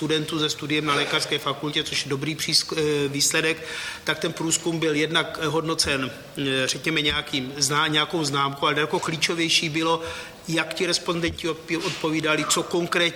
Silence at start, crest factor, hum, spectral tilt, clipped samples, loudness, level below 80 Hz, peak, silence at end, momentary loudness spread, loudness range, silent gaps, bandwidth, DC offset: 0 s; 20 dB; none; -3 dB/octave; under 0.1%; -23 LUFS; -54 dBFS; -6 dBFS; 0 s; 7 LU; 2 LU; none; 19.5 kHz; under 0.1%